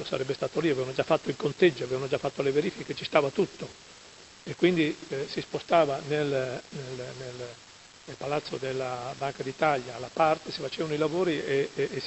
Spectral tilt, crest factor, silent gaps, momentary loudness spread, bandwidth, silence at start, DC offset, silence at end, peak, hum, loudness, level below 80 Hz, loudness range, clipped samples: -5.5 dB/octave; 24 dB; none; 17 LU; 8.4 kHz; 0 s; under 0.1%; 0 s; -6 dBFS; none; -29 LUFS; -64 dBFS; 5 LU; under 0.1%